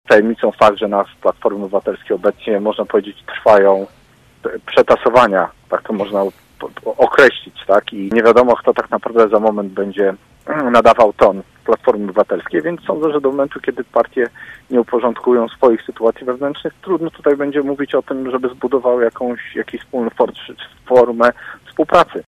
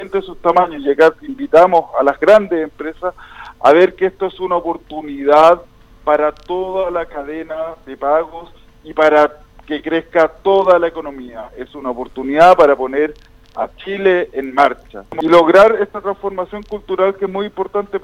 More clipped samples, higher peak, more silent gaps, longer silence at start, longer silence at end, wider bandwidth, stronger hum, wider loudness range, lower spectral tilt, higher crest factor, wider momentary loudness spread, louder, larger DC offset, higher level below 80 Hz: neither; about the same, 0 dBFS vs 0 dBFS; neither; about the same, 0.1 s vs 0 s; about the same, 0.1 s vs 0.05 s; about the same, 11.5 kHz vs 12 kHz; neither; about the same, 4 LU vs 4 LU; about the same, -6 dB/octave vs -6 dB/octave; about the same, 14 dB vs 14 dB; second, 13 LU vs 16 LU; about the same, -15 LUFS vs -14 LUFS; neither; second, -52 dBFS vs -46 dBFS